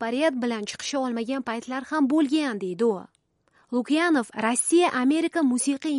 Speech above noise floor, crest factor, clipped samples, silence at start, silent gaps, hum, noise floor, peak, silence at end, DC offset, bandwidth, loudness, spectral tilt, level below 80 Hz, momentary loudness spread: 40 dB; 16 dB; under 0.1%; 0 s; none; none; -64 dBFS; -8 dBFS; 0 s; under 0.1%; 11.5 kHz; -24 LUFS; -3 dB/octave; -72 dBFS; 9 LU